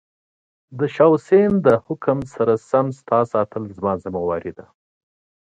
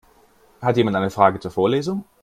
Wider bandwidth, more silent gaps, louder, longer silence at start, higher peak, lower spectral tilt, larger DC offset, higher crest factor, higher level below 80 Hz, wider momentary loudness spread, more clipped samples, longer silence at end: second, 8.8 kHz vs 14.5 kHz; neither; about the same, -19 LUFS vs -20 LUFS; about the same, 0.7 s vs 0.6 s; about the same, -2 dBFS vs 0 dBFS; first, -8.5 dB/octave vs -7 dB/octave; neither; about the same, 18 dB vs 20 dB; about the same, -52 dBFS vs -56 dBFS; first, 10 LU vs 7 LU; neither; first, 1 s vs 0.2 s